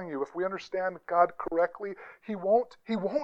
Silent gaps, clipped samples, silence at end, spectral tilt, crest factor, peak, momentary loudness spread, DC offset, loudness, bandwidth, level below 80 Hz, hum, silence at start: none; under 0.1%; 0 s; -7 dB/octave; 20 dB; -10 dBFS; 13 LU; under 0.1%; -30 LUFS; 7.6 kHz; -66 dBFS; none; 0 s